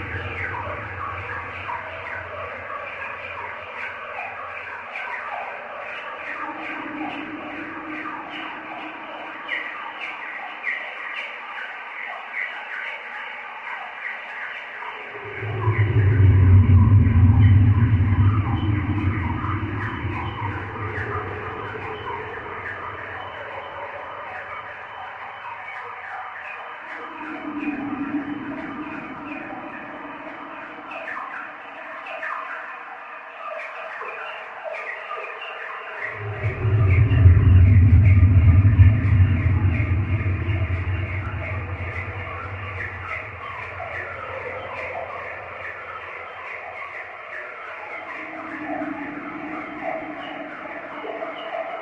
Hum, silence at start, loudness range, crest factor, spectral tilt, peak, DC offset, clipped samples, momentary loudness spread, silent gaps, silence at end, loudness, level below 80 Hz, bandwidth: none; 0 s; 16 LU; 22 dB; -9 dB/octave; -2 dBFS; under 0.1%; under 0.1%; 18 LU; none; 0 s; -24 LUFS; -34 dBFS; 3.7 kHz